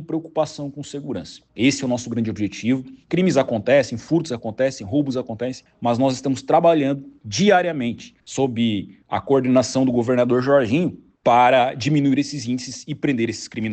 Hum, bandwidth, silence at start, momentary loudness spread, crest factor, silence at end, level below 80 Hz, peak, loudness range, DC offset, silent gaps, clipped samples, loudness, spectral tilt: none; 8.8 kHz; 0 s; 12 LU; 16 dB; 0 s; -58 dBFS; -4 dBFS; 3 LU; under 0.1%; none; under 0.1%; -20 LUFS; -5.5 dB/octave